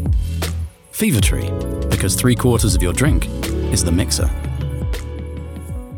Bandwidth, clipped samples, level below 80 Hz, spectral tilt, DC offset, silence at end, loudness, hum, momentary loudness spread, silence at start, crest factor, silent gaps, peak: 19.5 kHz; under 0.1%; -24 dBFS; -5 dB/octave; under 0.1%; 0 s; -19 LUFS; none; 13 LU; 0 s; 16 dB; none; -2 dBFS